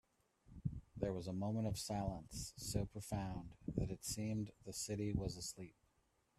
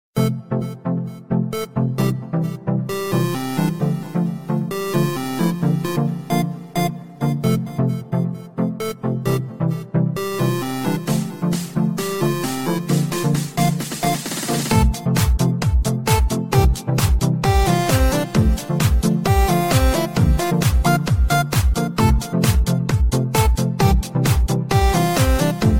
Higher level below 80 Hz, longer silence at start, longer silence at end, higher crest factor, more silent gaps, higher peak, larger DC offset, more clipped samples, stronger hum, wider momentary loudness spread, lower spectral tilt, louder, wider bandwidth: second, -58 dBFS vs -24 dBFS; first, 0.5 s vs 0.15 s; first, 0.65 s vs 0 s; about the same, 20 dB vs 16 dB; neither; second, -24 dBFS vs -2 dBFS; second, under 0.1% vs 0.3%; neither; neither; about the same, 7 LU vs 6 LU; about the same, -5.5 dB/octave vs -6 dB/octave; second, -44 LUFS vs -20 LUFS; second, 15 kHz vs 17 kHz